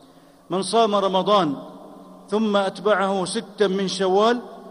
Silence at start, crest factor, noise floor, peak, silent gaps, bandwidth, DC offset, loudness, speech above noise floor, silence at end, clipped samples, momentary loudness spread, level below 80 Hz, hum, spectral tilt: 0.5 s; 16 dB; -50 dBFS; -6 dBFS; none; 11.5 kHz; under 0.1%; -21 LUFS; 30 dB; 0 s; under 0.1%; 9 LU; -68 dBFS; none; -4.5 dB/octave